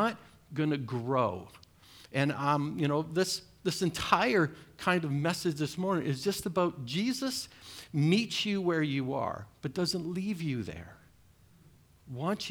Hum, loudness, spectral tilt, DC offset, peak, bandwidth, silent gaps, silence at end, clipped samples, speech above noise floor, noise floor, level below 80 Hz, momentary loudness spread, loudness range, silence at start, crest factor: none; -31 LUFS; -5 dB/octave; under 0.1%; -10 dBFS; over 20 kHz; none; 0 s; under 0.1%; 30 dB; -61 dBFS; -64 dBFS; 10 LU; 4 LU; 0 s; 22 dB